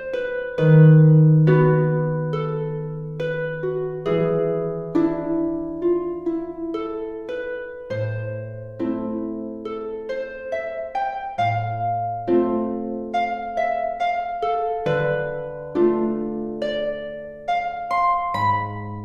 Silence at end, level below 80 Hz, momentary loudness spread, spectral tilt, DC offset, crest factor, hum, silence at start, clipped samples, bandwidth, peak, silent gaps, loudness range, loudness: 0 s; -52 dBFS; 14 LU; -9.5 dB/octave; under 0.1%; 16 dB; none; 0 s; under 0.1%; 5.2 kHz; -4 dBFS; none; 11 LU; -22 LUFS